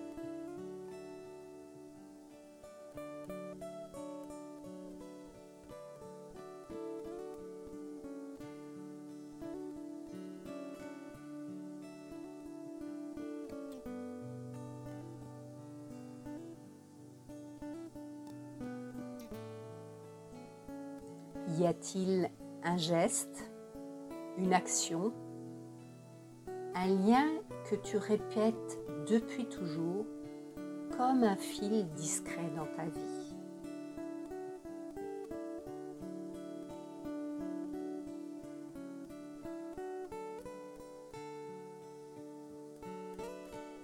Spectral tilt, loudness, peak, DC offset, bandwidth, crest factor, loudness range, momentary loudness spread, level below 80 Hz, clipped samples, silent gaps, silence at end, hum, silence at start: -5 dB/octave; -40 LUFS; -14 dBFS; under 0.1%; 16.5 kHz; 26 dB; 14 LU; 17 LU; -68 dBFS; under 0.1%; none; 0 s; none; 0 s